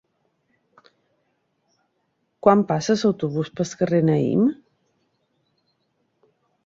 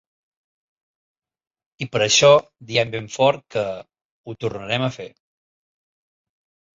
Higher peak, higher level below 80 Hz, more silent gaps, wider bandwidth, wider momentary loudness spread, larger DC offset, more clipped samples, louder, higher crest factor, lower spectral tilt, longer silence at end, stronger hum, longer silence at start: about the same, -2 dBFS vs -2 dBFS; about the same, -62 dBFS vs -60 dBFS; second, none vs 4.05-4.24 s; about the same, 7.8 kHz vs 8 kHz; second, 8 LU vs 21 LU; neither; neither; about the same, -21 LUFS vs -19 LUFS; about the same, 22 dB vs 22 dB; first, -7 dB/octave vs -3 dB/octave; first, 2.15 s vs 1.7 s; neither; first, 2.45 s vs 1.8 s